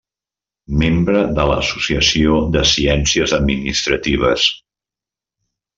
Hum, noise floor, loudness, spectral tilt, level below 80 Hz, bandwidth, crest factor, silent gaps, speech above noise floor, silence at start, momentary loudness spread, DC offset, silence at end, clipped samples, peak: none; -89 dBFS; -15 LUFS; -4 dB/octave; -30 dBFS; 7.8 kHz; 16 dB; none; 74 dB; 0.7 s; 4 LU; under 0.1%; 1.2 s; under 0.1%; 0 dBFS